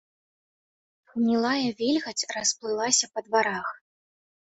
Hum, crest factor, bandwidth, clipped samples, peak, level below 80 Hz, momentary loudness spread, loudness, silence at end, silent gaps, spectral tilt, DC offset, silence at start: none; 20 dB; 8.4 kHz; under 0.1%; -8 dBFS; -70 dBFS; 8 LU; -25 LUFS; 0.75 s; none; -2 dB/octave; under 0.1%; 1.15 s